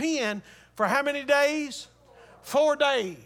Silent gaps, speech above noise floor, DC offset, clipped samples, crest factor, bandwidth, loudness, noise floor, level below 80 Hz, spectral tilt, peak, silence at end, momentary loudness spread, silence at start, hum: none; 28 dB; under 0.1%; under 0.1%; 18 dB; 18 kHz; -25 LUFS; -53 dBFS; -68 dBFS; -3 dB/octave; -8 dBFS; 0.05 s; 12 LU; 0 s; none